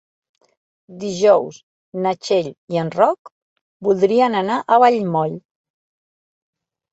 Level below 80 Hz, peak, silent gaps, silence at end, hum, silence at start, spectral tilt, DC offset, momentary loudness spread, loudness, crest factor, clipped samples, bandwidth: -66 dBFS; -2 dBFS; 1.63-1.92 s, 2.58-2.68 s, 3.19-3.25 s, 3.32-3.80 s; 1.55 s; none; 0.9 s; -6 dB/octave; under 0.1%; 16 LU; -18 LUFS; 18 dB; under 0.1%; 8.2 kHz